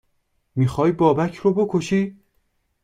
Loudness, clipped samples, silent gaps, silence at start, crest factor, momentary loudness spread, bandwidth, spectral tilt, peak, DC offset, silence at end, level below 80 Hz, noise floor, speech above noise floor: -20 LUFS; under 0.1%; none; 0.55 s; 16 dB; 6 LU; 11.5 kHz; -7.5 dB/octave; -4 dBFS; under 0.1%; 0.7 s; -52 dBFS; -68 dBFS; 49 dB